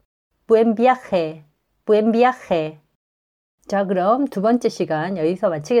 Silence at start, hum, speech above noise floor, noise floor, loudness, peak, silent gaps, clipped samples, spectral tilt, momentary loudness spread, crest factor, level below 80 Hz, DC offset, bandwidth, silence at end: 0.5 s; none; over 72 dB; under -90 dBFS; -19 LUFS; -4 dBFS; 2.95-3.58 s; under 0.1%; -6.5 dB/octave; 7 LU; 16 dB; -62 dBFS; under 0.1%; 11 kHz; 0 s